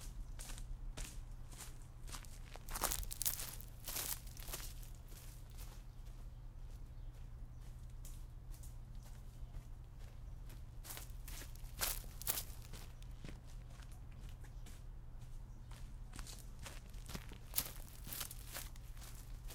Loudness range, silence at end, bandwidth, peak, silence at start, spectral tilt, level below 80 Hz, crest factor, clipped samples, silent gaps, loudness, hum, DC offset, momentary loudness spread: 12 LU; 0 s; 18 kHz; -12 dBFS; 0 s; -2.5 dB/octave; -50 dBFS; 36 dB; under 0.1%; none; -48 LUFS; none; under 0.1%; 15 LU